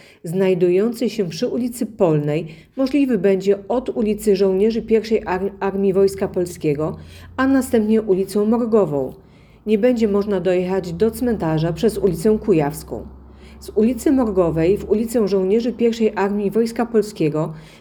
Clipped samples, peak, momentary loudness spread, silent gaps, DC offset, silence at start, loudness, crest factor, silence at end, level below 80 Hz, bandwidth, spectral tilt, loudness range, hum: under 0.1%; -4 dBFS; 8 LU; none; under 0.1%; 0.25 s; -19 LUFS; 16 dB; 0.15 s; -44 dBFS; 19 kHz; -7 dB/octave; 1 LU; none